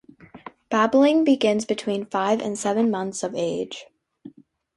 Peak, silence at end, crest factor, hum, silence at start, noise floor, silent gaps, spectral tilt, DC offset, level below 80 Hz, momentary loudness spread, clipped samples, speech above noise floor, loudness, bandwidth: -6 dBFS; 0.45 s; 18 dB; none; 0.35 s; -48 dBFS; none; -4.5 dB/octave; under 0.1%; -66 dBFS; 15 LU; under 0.1%; 26 dB; -22 LUFS; 11.5 kHz